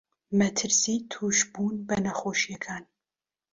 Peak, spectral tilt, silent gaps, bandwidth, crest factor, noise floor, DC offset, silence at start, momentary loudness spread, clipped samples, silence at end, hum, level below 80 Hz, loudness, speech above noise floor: -12 dBFS; -3 dB/octave; none; 7.8 kHz; 18 dB; under -90 dBFS; under 0.1%; 0.3 s; 10 LU; under 0.1%; 0.7 s; none; -62 dBFS; -26 LUFS; over 62 dB